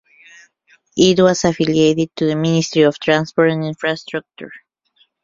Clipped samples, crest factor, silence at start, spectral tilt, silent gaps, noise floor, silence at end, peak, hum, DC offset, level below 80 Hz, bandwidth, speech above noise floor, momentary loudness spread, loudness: under 0.1%; 16 dB; 0.95 s; -5 dB/octave; none; -60 dBFS; 0.65 s; -2 dBFS; none; under 0.1%; -52 dBFS; 7.6 kHz; 44 dB; 14 LU; -16 LUFS